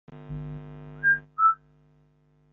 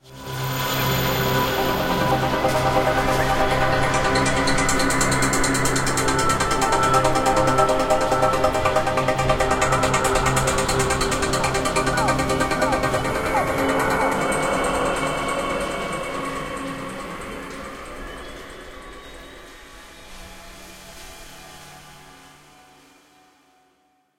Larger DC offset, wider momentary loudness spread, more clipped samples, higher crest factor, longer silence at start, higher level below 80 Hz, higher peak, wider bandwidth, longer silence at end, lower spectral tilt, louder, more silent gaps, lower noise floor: neither; second, 18 LU vs 21 LU; neither; about the same, 18 dB vs 18 dB; about the same, 0.1 s vs 0.05 s; second, -54 dBFS vs -36 dBFS; second, -12 dBFS vs -4 dBFS; second, 3.9 kHz vs 17 kHz; second, 1 s vs 1.9 s; about the same, -5 dB/octave vs -4 dB/octave; second, -24 LUFS vs -20 LUFS; neither; about the same, -63 dBFS vs -64 dBFS